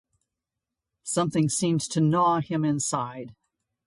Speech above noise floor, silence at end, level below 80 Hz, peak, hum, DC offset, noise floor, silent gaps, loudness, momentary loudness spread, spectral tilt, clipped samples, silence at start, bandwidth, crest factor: 62 dB; 0.55 s; -66 dBFS; -12 dBFS; none; under 0.1%; -87 dBFS; none; -25 LUFS; 16 LU; -5.5 dB/octave; under 0.1%; 1.05 s; 11.5 kHz; 16 dB